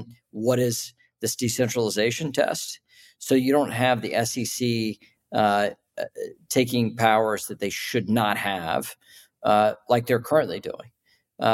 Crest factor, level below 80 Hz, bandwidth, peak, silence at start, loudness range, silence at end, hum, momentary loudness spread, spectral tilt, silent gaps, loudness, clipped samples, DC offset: 18 dB; -66 dBFS; 16.5 kHz; -6 dBFS; 0 s; 1 LU; 0 s; none; 14 LU; -4.5 dB/octave; none; -24 LUFS; under 0.1%; under 0.1%